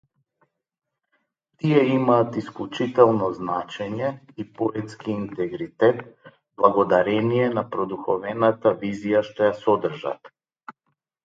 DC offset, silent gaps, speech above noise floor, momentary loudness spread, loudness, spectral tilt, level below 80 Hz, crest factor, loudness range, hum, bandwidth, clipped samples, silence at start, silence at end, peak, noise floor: under 0.1%; none; 54 dB; 12 LU; -23 LUFS; -8 dB/octave; -64 dBFS; 22 dB; 3 LU; none; 7.8 kHz; under 0.1%; 1.65 s; 0.55 s; -2 dBFS; -76 dBFS